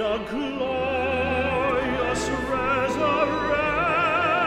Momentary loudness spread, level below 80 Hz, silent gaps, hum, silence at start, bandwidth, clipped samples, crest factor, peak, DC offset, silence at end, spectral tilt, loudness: 5 LU; -42 dBFS; none; none; 0 s; 14.5 kHz; under 0.1%; 14 dB; -10 dBFS; under 0.1%; 0 s; -5 dB/octave; -23 LUFS